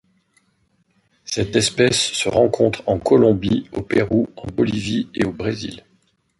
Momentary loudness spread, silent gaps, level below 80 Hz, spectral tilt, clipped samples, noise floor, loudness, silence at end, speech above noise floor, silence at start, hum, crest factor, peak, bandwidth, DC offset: 10 LU; none; -46 dBFS; -4.5 dB/octave; under 0.1%; -64 dBFS; -19 LUFS; 0.6 s; 45 dB; 1.25 s; none; 18 dB; -2 dBFS; 11.5 kHz; under 0.1%